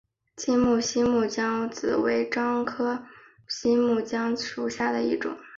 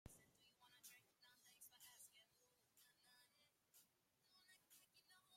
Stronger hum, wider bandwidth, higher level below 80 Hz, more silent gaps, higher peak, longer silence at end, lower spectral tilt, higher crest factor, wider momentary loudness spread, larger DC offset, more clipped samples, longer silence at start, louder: neither; second, 7.6 kHz vs 16.5 kHz; first, -58 dBFS vs -86 dBFS; neither; first, -12 dBFS vs -46 dBFS; about the same, 0 s vs 0 s; first, -4 dB/octave vs -1.5 dB/octave; second, 14 dB vs 26 dB; first, 7 LU vs 3 LU; neither; neither; first, 0.35 s vs 0.05 s; first, -26 LUFS vs -66 LUFS